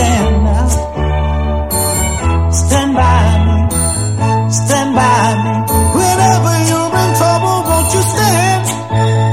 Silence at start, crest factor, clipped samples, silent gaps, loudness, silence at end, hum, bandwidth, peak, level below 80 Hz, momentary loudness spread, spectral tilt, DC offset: 0 s; 12 dB; under 0.1%; none; -12 LUFS; 0 s; none; 16 kHz; 0 dBFS; -20 dBFS; 5 LU; -5 dB/octave; 0.8%